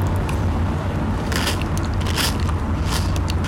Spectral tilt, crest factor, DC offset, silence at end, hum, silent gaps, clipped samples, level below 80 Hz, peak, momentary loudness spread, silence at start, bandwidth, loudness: -5 dB/octave; 12 dB; under 0.1%; 0 s; none; none; under 0.1%; -28 dBFS; -10 dBFS; 3 LU; 0 s; 17 kHz; -22 LUFS